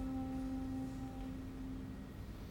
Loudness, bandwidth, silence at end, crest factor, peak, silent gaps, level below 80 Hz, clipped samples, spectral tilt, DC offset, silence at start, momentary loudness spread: -45 LUFS; 19 kHz; 0 s; 12 dB; -32 dBFS; none; -52 dBFS; under 0.1%; -7.5 dB/octave; under 0.1%; 0 s; 8 LU